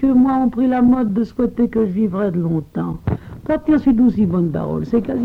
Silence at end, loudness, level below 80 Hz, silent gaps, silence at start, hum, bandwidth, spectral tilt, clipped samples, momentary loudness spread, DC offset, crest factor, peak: 0 s; -18 LUFS; -40 dBFS; none; 0 s; none; 5 kHz; -10.5 dB/octave; under 0.1%; 9 LU; under 0.1%; 12 dB; -6 dBFS